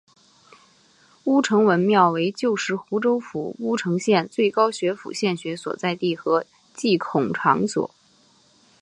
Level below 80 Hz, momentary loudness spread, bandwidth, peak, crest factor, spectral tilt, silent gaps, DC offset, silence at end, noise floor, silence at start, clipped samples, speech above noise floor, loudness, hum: -70 dBFS; 10 LU; 11 kHz; -4 dBFS; 20 dB; -5.5 dB/octave; none; under 0.1%; 0.95 s; -58 dBFS; 1.25 s; under 0.1%; 37 dB; -22 LUFS; none